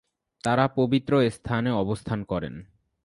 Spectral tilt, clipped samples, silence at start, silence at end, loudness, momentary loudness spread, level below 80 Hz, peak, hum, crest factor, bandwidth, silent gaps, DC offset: -7 dB/octave; under 0.1%; 0.45 s; 0.4 s; -25 LUFS; 10 LU; -52 dBFS; -6 dBFS; none; 20 dB; 11.5 kHz; none; under 0.1%